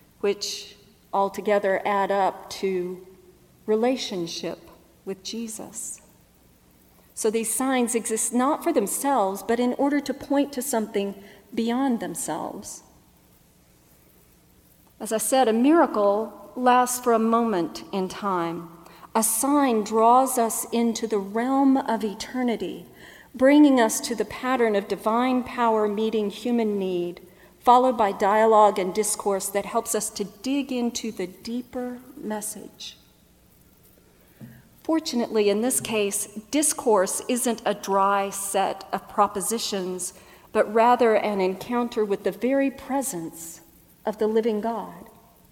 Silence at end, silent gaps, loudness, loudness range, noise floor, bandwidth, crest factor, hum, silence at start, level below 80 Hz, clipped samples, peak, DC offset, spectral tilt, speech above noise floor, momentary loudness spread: 0.45 s; none; -24 LUFS; 9 LU; -57 dBFS; 17 kHz; 20 dB; none; 0.25 s; -62 dBFS; under 0.1%; -4 dBFS; under 0.1%; -3.5 dB/octave; 34 dB; 15 LU